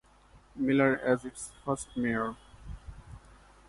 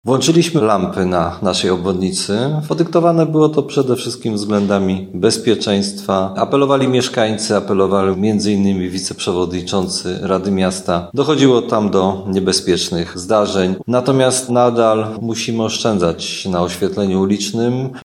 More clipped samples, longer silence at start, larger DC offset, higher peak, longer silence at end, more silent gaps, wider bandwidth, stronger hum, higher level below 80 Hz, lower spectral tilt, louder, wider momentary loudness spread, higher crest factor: neither; first, 0.35 s vs 0.05 s; neither; second, -12 dBFS vs 0 dBFS; first, 0.5 s vs 0.05 s; neither; second, 11.5 kHz vs 15.5 kHz; neither; about the same, -54 dBFS vs -50 dBFS; about the same, -6 dB/octave vs -5 dB/octave; second, -30 LUFS vs -16 LUFS; first, 24 LU vs 6 LU; about the same, 20 dB vs 16 dB